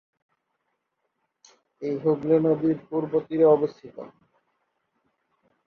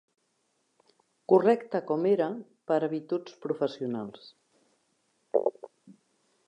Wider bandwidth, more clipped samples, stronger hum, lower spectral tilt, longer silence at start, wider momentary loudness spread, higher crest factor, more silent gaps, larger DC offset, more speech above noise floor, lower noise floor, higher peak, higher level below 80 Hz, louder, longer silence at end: second, 6.6 kHz vs 8.6 kHz; neither; neither; first, -9.5 dB/octave vs -8 dB/octave; first, 1.8 s vs 1.3 s; first, 20 LU vs 13 LU; about the same, 20 dB vs 22 dB; neither; neither; first, 54 dB vs 47 dB; about the same, -77 dBFS vs -75 dBFS; about the same, -6 dBFS vs -8 dBFS; first, -70 dBFS vs -86 dBFS; first, -23 LUFS vs -29 LUFS; first, 1.6 s vs 0.55 s